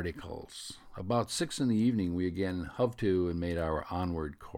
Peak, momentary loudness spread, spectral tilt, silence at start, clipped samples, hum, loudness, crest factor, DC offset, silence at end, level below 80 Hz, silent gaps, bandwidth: -16 dBFS; 15 LU; -6 dB/octave; 0 s; under 0.1%; none; -32 LUFS; 16 dB; under 0.1%; 0 s; -50 dBFS; none; 16 kHz